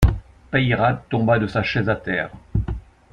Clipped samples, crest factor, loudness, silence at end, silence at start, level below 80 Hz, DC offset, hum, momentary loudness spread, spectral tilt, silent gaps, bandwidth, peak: under 0.1%; 20 dB; -21 LUFS; 0.3 s; 0 s; -30 dBFS; under 0.1%; none; 9 LU; -7.5 dB/octave; none; 15 kHz; -2 dBFS